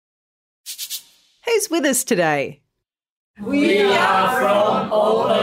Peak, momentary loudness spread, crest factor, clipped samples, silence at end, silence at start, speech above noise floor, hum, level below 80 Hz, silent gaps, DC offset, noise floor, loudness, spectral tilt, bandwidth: -4 dBFS; 15 LU; 16 dB; under 0.1%; 0 s; 0.65 s; 62 dB; none; -60 dBFS; 3.10-3.34 s; under 0.1%; -80 dBFS; -18 LUFS; -3.5 dB/octave; 16 kHz